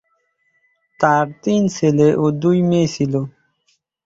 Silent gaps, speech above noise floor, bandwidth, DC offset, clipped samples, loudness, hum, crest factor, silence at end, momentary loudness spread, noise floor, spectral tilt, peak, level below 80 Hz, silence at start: none; 50 dB; 7.8 kHz; under 0.1%; under 0.1%; -17 LUFS; none; 16 dB; 0.75 s; 6 LU; -66 dBFS; -7 dB/octave; -2 dBFS; -56 dBFS; 1 s